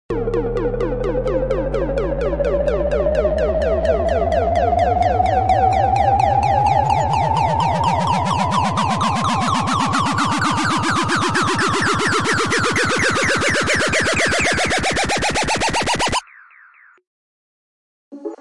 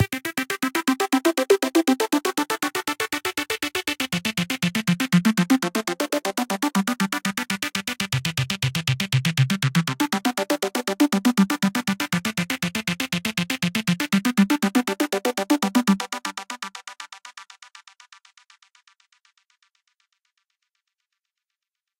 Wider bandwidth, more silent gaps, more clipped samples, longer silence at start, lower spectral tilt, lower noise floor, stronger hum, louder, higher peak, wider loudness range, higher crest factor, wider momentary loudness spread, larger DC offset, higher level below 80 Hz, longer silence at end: second, 11.5 kHz vs 17 kHz; first, 17.07-18.11 s vs none; neither; about the same, 0.1 s vs 0 s; about the same, -4 dB/octave vs -4.5 dB/octave; second, -49 dBFS vs -85 dBFS; neither; first, -17 LUFS vs -23 LUFS; about the same, -4 dBFS vs -6 dBFS; about the same, 3 LU vs 4 LU; about the same, 14 dB vs 18 dB; about the same, 5 LU vs 6 LU; first, 1% vs under 0.1%; first, -32 dBFS vs -62 dBFS; second, 0 s vs 4.55 s